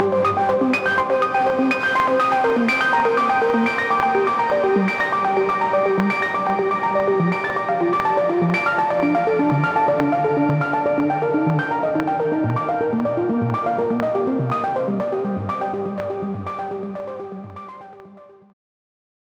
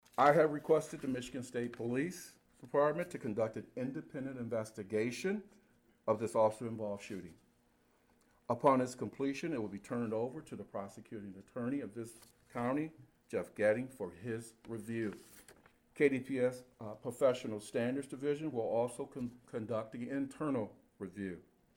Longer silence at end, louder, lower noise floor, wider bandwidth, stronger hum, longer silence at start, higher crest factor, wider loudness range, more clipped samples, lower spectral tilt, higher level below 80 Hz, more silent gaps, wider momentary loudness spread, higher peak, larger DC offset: first, 1.05 s vs 0.35 s; first, -20 LUFS vs -37 LUFS; second, -45 dBFS vs -72 dBFS; second, 13 kHz vs 17.5 kHz; neither; second, 0 s vs 0.2 s; about the same, 18 dB vs 22 dB; first, 8 LU vs 4 LU; neither; first, -7.5 dB/octave vs -6 dB/octave; first, -58 dBFS vs -74 dBFS; neither; second, 8 LU vs 15 LU; first, -2 dBFS vs -16 dBFS; neither